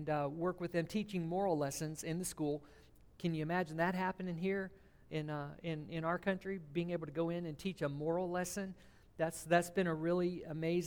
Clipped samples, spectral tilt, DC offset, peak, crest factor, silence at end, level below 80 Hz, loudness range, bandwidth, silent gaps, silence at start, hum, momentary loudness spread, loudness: under 0.1%; -6 dB/octave; under 0.1%; -20 dBFS; 18 dB; 0 s; -66 dBFS; 3 LU; 19.5 kHz; none; 0 s; none; 8 LU; -39 LUFS